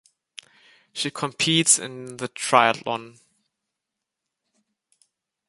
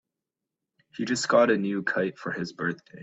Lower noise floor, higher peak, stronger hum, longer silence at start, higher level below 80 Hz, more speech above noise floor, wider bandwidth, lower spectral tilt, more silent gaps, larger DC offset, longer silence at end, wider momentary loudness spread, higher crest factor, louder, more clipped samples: about the same, -84 dBFS vs -87 dBFS; first, -2 dBFS vs -8 dBFS; neither; about the same, 0.95 s vs 0.95 s; about the same, -72 dBFS vs -68 dBFS; about the same, 61 dB vs 61 dB; first, 12 kHz vs 8.4 kHz; second, -2 dB/octave vs -4.5 dB/octave; neither; neither; first, 2.4 s vs 0 s; first, 16 LU vs 12 LU; first, 26 dB vs 20 dB; first, -21 LUFS vs -26 LUFS; neither